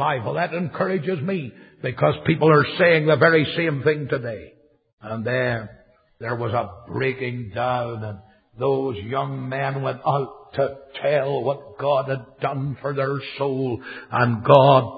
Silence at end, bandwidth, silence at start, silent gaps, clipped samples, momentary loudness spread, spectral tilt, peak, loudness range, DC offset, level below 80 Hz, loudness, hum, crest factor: 0 s; 5 kHz; 0 s; 4.93-4.98 s; under 0.1%; 14 LU; -9.5 dB/octave; 0 dBFS; 7 LU; under 0.1%; -54 dBFS; -22 LUFS; none; 22 dB